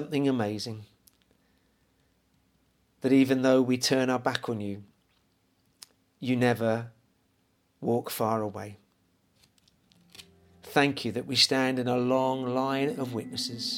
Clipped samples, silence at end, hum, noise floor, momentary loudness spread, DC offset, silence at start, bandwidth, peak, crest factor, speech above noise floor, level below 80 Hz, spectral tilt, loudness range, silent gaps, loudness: under 0.1%; 0 s; none; -70 dBFS; 14 LU; under 0.1%; 0 s; 17.5 kHz; -8 dBFS; 22 dB; 43 dB; -72 dBFS; -4.5 dB/octave; 8 LU; none; -27 LUFS